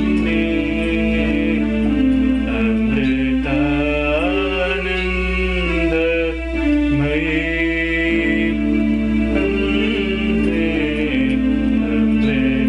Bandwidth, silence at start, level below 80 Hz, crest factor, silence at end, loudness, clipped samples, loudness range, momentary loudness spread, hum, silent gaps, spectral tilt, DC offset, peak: 10 kHz; 0 s; -28 dBFS; 10 dB; 0 s; -18 LUFS; under 0.1%; 1 LU; 2 LU; none; none; -7.5 dB/octave; under 0.1%; -6 dBFS